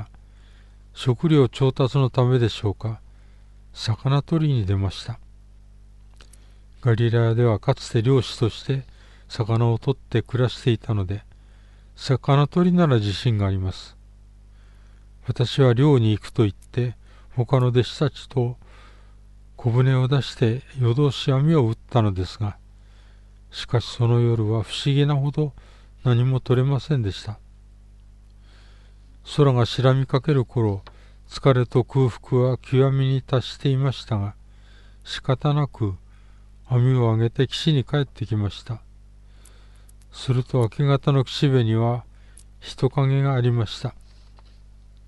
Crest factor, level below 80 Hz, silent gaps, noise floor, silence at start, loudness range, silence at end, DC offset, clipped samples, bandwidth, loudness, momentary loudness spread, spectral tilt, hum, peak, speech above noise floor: 16 dB; -46 dBFS; none; -47 dBFS; 0 s; 4 LU; 1.15 s; under 0.1%; under 0.1%; 10.5 kHz; -22 LUFS; 12 LU; -7.5 dB/octave; 50 Hz at -45 dBFS; -6 dBFS; 27 dB